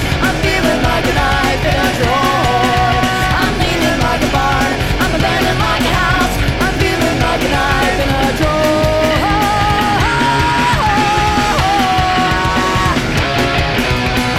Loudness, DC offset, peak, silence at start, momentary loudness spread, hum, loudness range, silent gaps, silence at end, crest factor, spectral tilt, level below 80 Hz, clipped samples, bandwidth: -13 LUFS; under 0.1%; 0 dBFS; 0 s; 2 LU; none; 1 LU; none; 0 s; 14 dB; -4.5 dB/octave; -24 dBFS; under 0.1%; 17 kHz